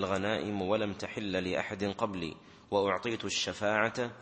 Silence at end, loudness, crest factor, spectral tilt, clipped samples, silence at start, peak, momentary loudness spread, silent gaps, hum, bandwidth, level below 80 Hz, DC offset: 0 s; -33 LUFS; 20 dB; -4 dB/octave; under 0.1%; 0 s; -12 dBFS; 6 LU; none; none; 8.4 kHz; -64 dBFS; under 0.1%